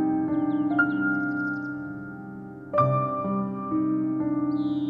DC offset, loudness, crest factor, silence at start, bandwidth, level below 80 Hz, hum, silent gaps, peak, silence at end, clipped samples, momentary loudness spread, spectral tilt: under 0.1%; -26 LUFS; 16 dB; 0 s; 4.8 kHz; -62 dBFS; none; none; -10 dBFS; 0 s; under 0.1%; 14 LU; -10 dB/octave